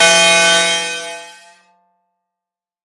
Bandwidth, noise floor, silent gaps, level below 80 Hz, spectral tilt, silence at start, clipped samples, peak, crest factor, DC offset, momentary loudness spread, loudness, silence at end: 11.5 kHz; -86 dBFS; none; -68 dBFS; 0 dB/octave; 0 s; under 0.1%; -2 dBFS; 16 dB; under 0.1%; 20 LU; -11 LUFS; 1.55 s